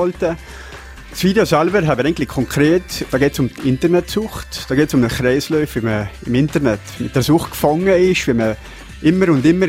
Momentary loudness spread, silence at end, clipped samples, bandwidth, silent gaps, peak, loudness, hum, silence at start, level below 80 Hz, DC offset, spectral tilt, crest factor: 11 LU; 0 s; under 0.1%; 16 kHz; none; 0 dBFS; -16 LUFS; none; 0 s; -36 dBFS; under 0.1%; -6 dB/octave; 16 dB